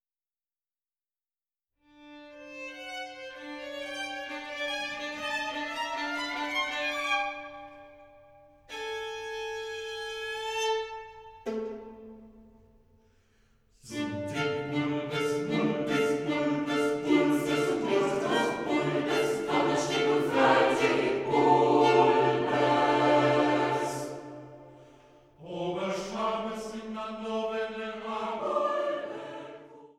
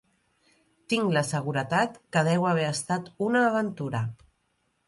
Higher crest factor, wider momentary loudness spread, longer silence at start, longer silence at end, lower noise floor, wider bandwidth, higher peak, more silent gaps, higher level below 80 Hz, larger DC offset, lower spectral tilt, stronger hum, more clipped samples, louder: about the same, 20 dB vs 18 dB; first, 18 LU vs 8 LU; first, 2 s vs 0.9 s; second, 0.1 s vs 0.75 s; first, under -90 dBFS vs -73 dBFS; first, 15 kHz vs 11.5 kHz; about the same, -8 dBFS vs -10 dBFS; neither; about the same, -66 dBFS vs -66 dBFS; neither; about the same, -5 dB/octave vs -5.5 dB/octave; neither; neither; about the same, -29 LUFS vs -27 LUFS